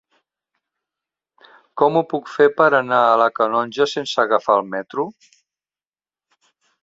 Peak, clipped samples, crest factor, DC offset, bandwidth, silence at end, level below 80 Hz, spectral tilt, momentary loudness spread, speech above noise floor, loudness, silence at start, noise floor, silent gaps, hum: -2 dBFS; under 0.1%; 20 dB; under 0.1%; 7.8 kHz; 1.7 s; -68 dBFS; -5 dB/octave; 12 LU; over 72 dB; -18 LUFS; 1.75 s; under -90 dBFS; none; none